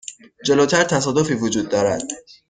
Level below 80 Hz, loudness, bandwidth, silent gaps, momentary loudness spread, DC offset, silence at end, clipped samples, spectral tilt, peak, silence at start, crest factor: -54 dBFS; -19 LUFS; 9.8 kHz; none; 11 LU; under 0.1%; 0.3 s; under 0.1%; -4 dB/octave; -2 dBFS; 0.1 s; 16 dB